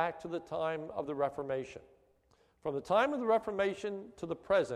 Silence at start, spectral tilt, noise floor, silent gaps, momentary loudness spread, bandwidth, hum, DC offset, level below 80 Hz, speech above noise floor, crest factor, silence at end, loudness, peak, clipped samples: 0 s; -5.5 dB/octave; -70 dBFS; none; 12 LU; 12 kHz; none; under 0.1%; -68 dBFS; 36 dB; 18 dB; 0 s; -35 LUFS; -16 dBFS; under 0.1%